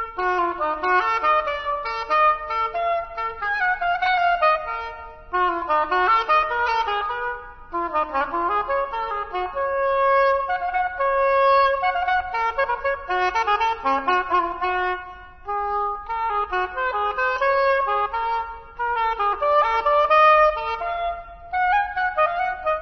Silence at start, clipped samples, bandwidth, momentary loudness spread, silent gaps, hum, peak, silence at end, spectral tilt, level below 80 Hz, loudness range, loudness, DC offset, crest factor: 0 s; under 0.1%; 6.2 kHz; 9 LU; none; none; -6 dBFS; 0 s; -4 dB/octave; -46 dBFS; 4 LU; -21 LUFS; under 0.1%; 16 dB